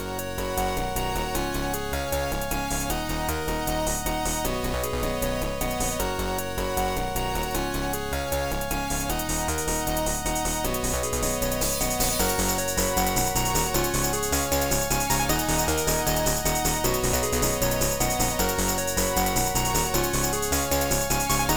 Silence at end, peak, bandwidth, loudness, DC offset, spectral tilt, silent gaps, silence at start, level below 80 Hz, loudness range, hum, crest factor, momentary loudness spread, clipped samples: 0 s; -10 dBFS; over 20 kHz; -25 LUFS; 0.9%; -3 dB/octave; none; 0 s; -34 dBFS; 4 LU; none; 16 dB; 5 LU; under 0.1%